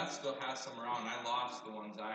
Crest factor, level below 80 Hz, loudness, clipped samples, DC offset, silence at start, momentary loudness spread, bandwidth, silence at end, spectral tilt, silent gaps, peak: 16 dB; under -90 dBFS; -40 LUFS; under 0.1%; under 0.1%; 0 s; 7 LU; 9 kHz; 0 s; -2.5 dB/octave; none; -26 dBFS